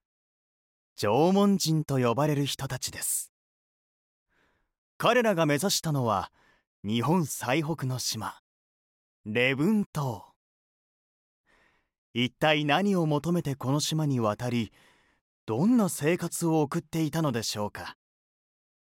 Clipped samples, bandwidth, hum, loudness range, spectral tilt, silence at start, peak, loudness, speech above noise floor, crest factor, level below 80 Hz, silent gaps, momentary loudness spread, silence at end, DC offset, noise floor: under 0.1%; 17 kHz; none; 4 LU; -5 dB/octave; 1 s; -10 dBFS; -27 LUFS; 44 dB; 20 dB; -64 dBFS; 3.29-4.26 s, 4.78-5.00 s, 6.67-6.83 s, 8.39-9.24 s, 9.86-9.93 s, 10.36-11.44 s, 11.98-12.14 s, 15.21-15.47 s; 11 LU; 0.95 s; under 0.1%; -71 dBFS